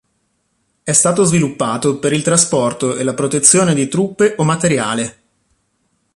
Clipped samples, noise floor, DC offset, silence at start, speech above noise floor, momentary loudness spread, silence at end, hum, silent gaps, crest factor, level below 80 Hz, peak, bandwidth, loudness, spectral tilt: under 0.1%; -65 dBFS; under 0.1%; 0.85 s; 51 dB; 8 LU; 1.05 s; none; none; 16 dB; -52 dBFS; 0 dBFS; 12.5 kHz; -14 LUFS; -4 dB/octave